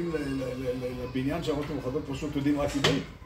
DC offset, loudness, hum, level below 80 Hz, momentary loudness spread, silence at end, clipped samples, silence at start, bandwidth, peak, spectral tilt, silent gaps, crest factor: under 0.1%; -30 LUFS; none; -46 dBFS; 7 LU; 0 s; under 0.1%; 0 s; 16 kHz; -10 dBFS; -5.5 dB/octave; none; 20 dB